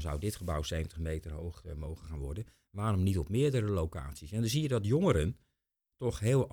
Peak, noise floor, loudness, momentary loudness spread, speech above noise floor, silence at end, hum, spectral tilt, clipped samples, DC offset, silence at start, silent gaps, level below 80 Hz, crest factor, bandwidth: -12 dBFS; -85 dBFS; -34 LUFS; 13 LU; 52 dB; 0 s; none; -6.5 dB/octave; under 0.1%; under 0.1%; 0 s; none; -44 dBFS; 20 dB; 20 kHz